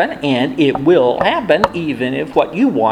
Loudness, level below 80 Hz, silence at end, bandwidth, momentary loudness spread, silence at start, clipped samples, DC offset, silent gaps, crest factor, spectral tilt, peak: -15 LUFS; -46 dBFS; 0 s; 12 kHz; 6 LU; 0 s; under 0.1%; under 0.1%; none; 14 dB; -6.5 dB/octave; 0 dBFS